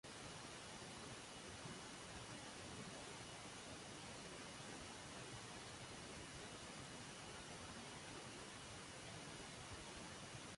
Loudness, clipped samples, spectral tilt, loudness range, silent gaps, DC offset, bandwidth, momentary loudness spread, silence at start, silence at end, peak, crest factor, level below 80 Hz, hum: -53 LUFS; under 0.1%; -3 dB/octave; 0 LU; none; under 0.1%; 11.5 kHz; 1 LU; 0.05 s; 0 s; -40 dBFS; 14 dB; -70 dBFS; none